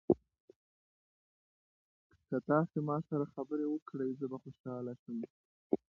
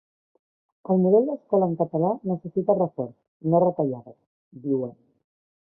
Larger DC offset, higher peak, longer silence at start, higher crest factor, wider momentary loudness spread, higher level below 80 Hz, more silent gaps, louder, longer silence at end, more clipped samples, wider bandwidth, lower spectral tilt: neither; second, -14 dBFS vs -6 dBFS; second, 0.1 s vs 0.9 s; first, 24 dB vs 18 dB; second, 12 LU vs 15 LU; about the same, -74 dBFS vs -70 dBFS; first, 0.40-0.48 s, 0.56-2.10 s, 3.82-3.86 s, 4.60-4.64 s, 4.99-5.06 s, 5.30-5.70 s vs 3.28-3.40 s, 4.27-4.51 s; second, -38 LUFS vs -24 LUFS; second, 0.2 s vs 0.7 s; neither; first, 5.2 kHz vs 1.5 kHz; second, -10.5 dB/octave vs -16 dB/octave